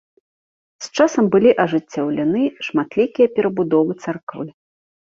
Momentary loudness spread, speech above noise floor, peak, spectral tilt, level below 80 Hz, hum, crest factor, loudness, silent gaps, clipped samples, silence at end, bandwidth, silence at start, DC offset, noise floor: 14 LU; over 72 dB; -2 dBFS; -6 dB/octave; -60 dBFS; none; 16 dB; -18 LUFS; 4.23-4.27 s; under 0.1%; 0.55 s; 7.6 kHz; 0.8 s; under 0.1%; under -90 dBFS